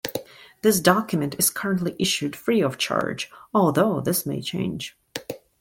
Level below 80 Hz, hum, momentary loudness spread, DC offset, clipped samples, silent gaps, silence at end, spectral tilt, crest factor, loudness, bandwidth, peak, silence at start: -60 dBFS; none; 15 LU; under 0.1%; under 0.1%; none; 0.25 s; -4 dB/octave; 22 dB; -23 LUFS; 17 kHz; -2 dBFS; 0.05 s